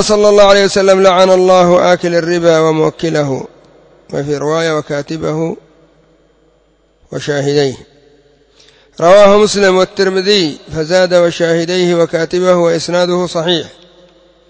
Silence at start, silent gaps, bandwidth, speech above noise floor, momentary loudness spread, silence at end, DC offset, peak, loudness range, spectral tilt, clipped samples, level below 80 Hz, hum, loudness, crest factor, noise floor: 0 s; none; 8 kHz; 43 dB; 13 LU; 0.8 s; under 0.1%; 0 dBFS; 10 LU; -4.5 dB/octave; 0.5%; -46 dBFS; none; -11 LUFS; 12 dB; -53 dBFS